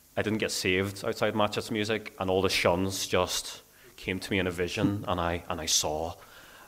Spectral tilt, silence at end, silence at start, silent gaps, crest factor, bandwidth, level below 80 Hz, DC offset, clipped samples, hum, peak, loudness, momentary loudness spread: -3.5 dB/octave; 0 s; 0.15 s; none; 22 dB; 16 kHz; -54 dBFS; under 0.1%; under 0.1%; none; -8 dBFS; -29 LUFS; 9 LU